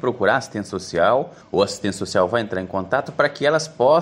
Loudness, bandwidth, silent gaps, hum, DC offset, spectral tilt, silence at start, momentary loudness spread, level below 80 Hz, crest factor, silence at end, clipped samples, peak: -21 LUFS; 12 kHz; none; none; under 0.1%; -4.5 dB/octave; 0.05 s; 7 LU; -58 dBFS; 18 dB; 0 s; under 0.1%; -2 dBFS